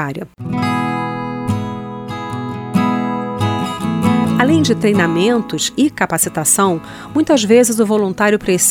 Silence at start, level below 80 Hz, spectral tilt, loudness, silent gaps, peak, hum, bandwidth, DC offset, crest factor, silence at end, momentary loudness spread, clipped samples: 0 s; -48 dBFS; -4.5 dB/octave; -16 LUFS; none; 0 dBFS; none; 18 kHz; under 0.1%; 16 dB; 0 s; 11 LU; under 0.1%